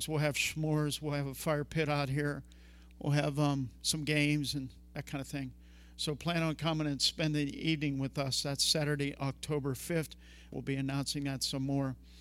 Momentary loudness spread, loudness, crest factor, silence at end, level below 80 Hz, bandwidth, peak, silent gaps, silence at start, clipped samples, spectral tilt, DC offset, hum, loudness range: 11 LU; -34 LUFS; 18 dB; 0 s; -56 dBFS; 16 kHz; -16 dBFS; none; 0 s; under 0.1%; -4.5 dB/octave; under 0.1%; none; 3 LU